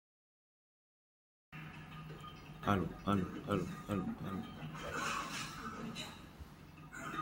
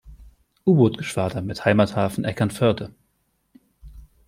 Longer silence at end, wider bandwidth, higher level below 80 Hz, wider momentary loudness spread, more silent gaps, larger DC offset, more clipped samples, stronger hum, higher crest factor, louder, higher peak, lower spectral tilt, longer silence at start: second, 0 s vs 0.25 s; about the same, 16.5 kHz vs 15.5 kHz; second, -62 dBFS vs -50 dBFS; first, 16 LU vs 8 LU; neither; neither; neither; neither; first, 26 dB vs 20 dB; second, -41 LUFS vs -22 LUFS; second, -18 dBFS vs -4 dBFS; second, -5.5 dB/octave vs -7 dB/octave; first, 1.5 s vs 0.05 s